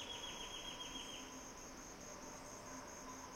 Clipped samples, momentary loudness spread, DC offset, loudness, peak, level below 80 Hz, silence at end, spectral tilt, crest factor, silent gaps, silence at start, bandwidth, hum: under 0.1%; 6 LU; under 0.1%; -50 LUFS; -36 dBFS; -66 dBFS; 0 s; -1.5 dB/octave; 14 dB; none; 0 s; 16.5 kHz; none